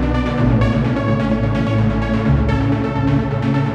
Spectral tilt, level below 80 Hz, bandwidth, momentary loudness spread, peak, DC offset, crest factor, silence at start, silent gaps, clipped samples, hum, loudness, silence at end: -8.5 dB/octave; -26 dBFS; 7.6 kHz; 2 LU; -2 dBFS; under 0.1%; 12 dB; 0 s; none; under 0.1%; none; -17 LUFS; 0 s